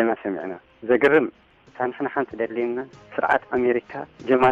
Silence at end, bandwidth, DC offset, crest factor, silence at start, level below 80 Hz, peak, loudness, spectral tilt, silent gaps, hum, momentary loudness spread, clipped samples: 0 s; 7.4 kHz; under 0.1%; 16 dB; 0 s; -60 dBFS; -8 dBFS; -23 LUFS; -7 dB/octave; none; none; 14 LU; under 0.1%